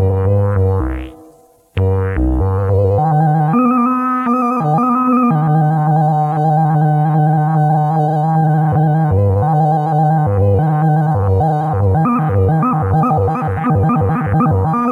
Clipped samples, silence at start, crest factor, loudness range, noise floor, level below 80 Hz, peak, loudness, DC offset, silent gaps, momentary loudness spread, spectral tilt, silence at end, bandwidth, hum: under 0.1%; 0 s; 10 dB; 2 LU; -46 dBFS; -32 dBFS; -2 dBFS; -14 LUFS; under 0.1%; none; 3 LU; -10.5 dB/octave; 0 s; 4 kHz; none